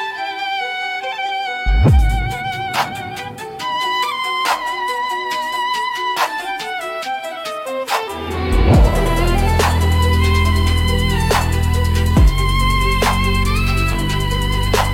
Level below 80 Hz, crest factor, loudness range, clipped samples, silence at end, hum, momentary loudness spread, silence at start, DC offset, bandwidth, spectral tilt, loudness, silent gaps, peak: -20 dBFS; 14 dB; 5 LU; under 0.1%; 0 s; none; 9 LU; 0 s; under 0.1%; 17 kHz; -5 dB/octave; -18 LUFS; none; -2 dBFS